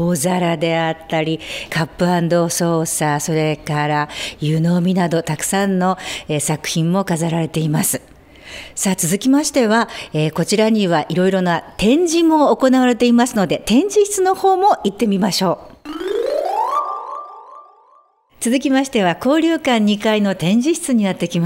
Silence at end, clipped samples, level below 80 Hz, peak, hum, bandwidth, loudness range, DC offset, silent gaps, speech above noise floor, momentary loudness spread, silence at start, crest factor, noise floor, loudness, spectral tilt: 0 s; under 0.1%; -50 dBFS; -2 dBFS; none; 16 kHz; 5 LU; under 0.1%; none; 37 dB; 8 LU; 0 s; 14 dB; -53 dBFS; -17 LUFS; -5 dB/octave